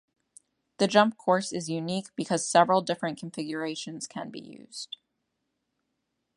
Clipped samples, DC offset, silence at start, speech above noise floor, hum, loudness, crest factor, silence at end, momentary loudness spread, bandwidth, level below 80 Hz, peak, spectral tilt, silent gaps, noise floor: under 0.1%; under 0.1%; 0.8 s; 53 dB; none; -27 LUFS; 24 dB; 1.5 s; 18 LU; 11.5 kHz; -76 dBFS; -6 dBFS; -4 dB/octave; none; -80 dBFS